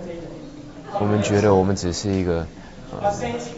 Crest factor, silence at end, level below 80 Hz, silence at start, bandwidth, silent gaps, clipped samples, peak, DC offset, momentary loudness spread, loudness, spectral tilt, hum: 18 dB; 0 s; -42 dBFS; 0 s; 8 kHz; none; under 0.1%; -4 dBFS; 0.1%; 20 LU; -21 LUFS; -6 dB/octave; none